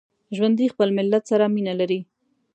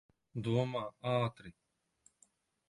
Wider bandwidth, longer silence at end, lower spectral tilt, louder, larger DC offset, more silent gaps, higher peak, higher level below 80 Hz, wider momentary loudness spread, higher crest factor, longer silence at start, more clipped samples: second, 8.8 kHz vs 11.5 kHz; second, 0.5 s vs 1.2 s; about the same, -7 dB/octave vs -7.5 dB/octave; first, -21 LUFS vs -37 LUFS; neither; neither; first, -6 dBFS vs -20 dBFS; second, -76 dBFS vs -70 dBFS; second, 6 LU vs 18 LU; about the same, 16 dB vs 20 dB; about the same, 0.3 s vs 0.35 s; neither